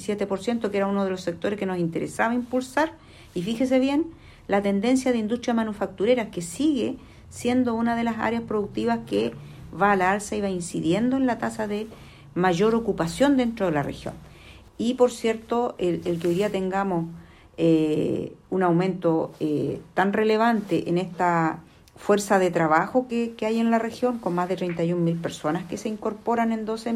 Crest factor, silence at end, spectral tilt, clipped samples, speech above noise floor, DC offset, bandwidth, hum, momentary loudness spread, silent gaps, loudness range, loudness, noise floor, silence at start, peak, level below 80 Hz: 18 dB; 0 s; -6 dB/octave; under 0.1%; 24 dB; under 0.1%; 15.5 kHz; none; 9 LU; none; 3 LU; -24 LUFS; -47 dBFS; 0 s; -6 dBFS; -54 dBFS